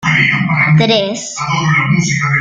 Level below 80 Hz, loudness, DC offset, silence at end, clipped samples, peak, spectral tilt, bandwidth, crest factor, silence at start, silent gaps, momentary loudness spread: -46 dBFS; -12 LUFS; under 0.1%; 0 s; under 0.1%; 0 dBFS; -4.5 dB/octave; 9 kHz; 12 dB; 0 s; none; 7 LU